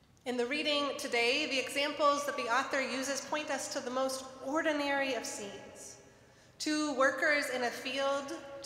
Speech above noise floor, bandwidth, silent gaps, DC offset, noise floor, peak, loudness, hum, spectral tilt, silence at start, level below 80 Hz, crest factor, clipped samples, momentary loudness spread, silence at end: 27 dB; 16 kHz; none; under 0.1%; -60 dBFS; -16 dBFS; -32 LUFS; none; -1.5 dB/octave; 0.25 s; -74 dBFS; 18 dB; under 0.1%; 11 LU; 0 s